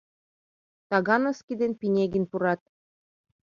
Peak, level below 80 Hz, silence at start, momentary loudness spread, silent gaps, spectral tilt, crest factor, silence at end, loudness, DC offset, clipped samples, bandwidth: -8 dBFS; -64 dBFS; 0.9 s; 6 LU; 1.43-1.48 s; -7 dB/octave; 20 dB; 0.9 s; -26 LUFS; under 0.1%; under 0.1%; 7.4 kHz